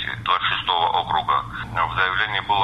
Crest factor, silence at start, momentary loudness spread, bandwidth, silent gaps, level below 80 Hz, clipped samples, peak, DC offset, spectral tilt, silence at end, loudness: 18 dB; 0 s; 4 LU; 12 kHz; none; -44 dBFS; under 0.1%; -4 dBFS; under 0.1%; -4.5 dB/octave; 0 s; -21 LUFS